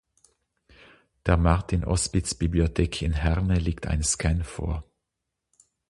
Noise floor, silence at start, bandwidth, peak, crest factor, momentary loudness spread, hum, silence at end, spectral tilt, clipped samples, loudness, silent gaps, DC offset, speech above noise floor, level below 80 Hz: -83 dBFS; 1.25 s; 11.5 kHz; -4 dBFS; 22 dB; 8 LU; none; 1.1 s; -5 dB/octave; under 0.1%; -26 LUFS; none; under 0.1%; 59 dB; -32 dBFS